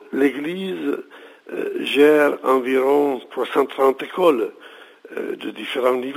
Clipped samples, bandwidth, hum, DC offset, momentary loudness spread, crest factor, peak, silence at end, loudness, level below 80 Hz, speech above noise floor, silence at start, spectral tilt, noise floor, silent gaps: under 0.1%; 16 kHz; none; under 0.1%; 13 LU; 18 dB; -2 dBFS; 0 s; -20 LUFS; -80 dBFS; 24 dB; 0.1 s; -5 dB/octave; -43 dBFS; none